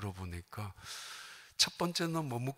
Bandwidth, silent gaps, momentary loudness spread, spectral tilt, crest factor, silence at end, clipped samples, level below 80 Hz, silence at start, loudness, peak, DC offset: 16 kHz; none; 16 LU; -3.5 dB/octave; 22 dB; 0.05 s; under 0.1%; -64 dBFS; 0 s; -36 LUFS; -14 dBFS; under 0.1%